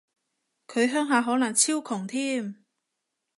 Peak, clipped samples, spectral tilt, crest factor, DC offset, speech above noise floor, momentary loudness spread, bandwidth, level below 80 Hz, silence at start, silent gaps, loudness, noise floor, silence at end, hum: -8 dBFS; under 0.1%; -2.5 dB/octave; 20 dB; under 0.1%; 57 dB; 10 LU; 11.5 kHz; -82 dBFS; 0.7 s; none; -25 LUFS; -82 dBFS; 0.85 s; none